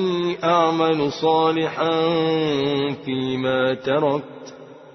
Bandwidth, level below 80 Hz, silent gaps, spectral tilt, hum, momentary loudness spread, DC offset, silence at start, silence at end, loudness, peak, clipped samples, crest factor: 6.2 kHz; -60 dBFS; none; -6.5 dB/octave; none; 7 LU; under 0.1%; 0 s; 0.05 s; -21 LUFS; -4 dBFS; under 0.1%; 16 dB